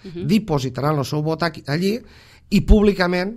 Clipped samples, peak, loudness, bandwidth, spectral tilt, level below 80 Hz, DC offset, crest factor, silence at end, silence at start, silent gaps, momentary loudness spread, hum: under 0.1%; 0 dBFS; -20 LUFS; 15 kHz; -6.5 dB/octave; -28 dBFS; under 0.1%; 20 dB; 0 s; 0.05 s; none; 8 LU; none